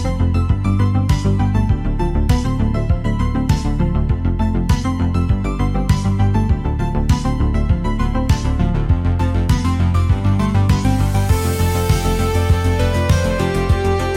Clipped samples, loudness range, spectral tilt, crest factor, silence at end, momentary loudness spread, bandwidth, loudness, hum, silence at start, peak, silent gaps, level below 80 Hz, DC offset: under 0.1%; 2 LU; -7 dB/octave; 12 dB; 0 s; 3 LU; 16.5 kHz; -17 LUFS; none; 0 s; -4 dBFS; none; -20 dBFS; under 0.1%